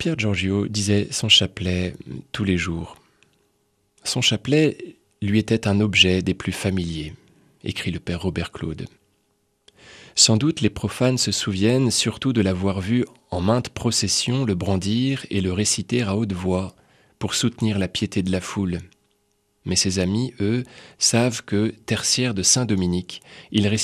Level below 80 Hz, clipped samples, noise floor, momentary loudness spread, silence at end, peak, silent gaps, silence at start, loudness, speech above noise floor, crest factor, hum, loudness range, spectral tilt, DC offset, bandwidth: -48 dBFS; under 0.1%; -68 dBFS; 14 LU; 0 s; 0 dBFS; none; 0 s; -21 LUFS; 46 dB; 22 dB; none; 5 LU; -4 dB/octave; under 0.1%; 13.5 kHz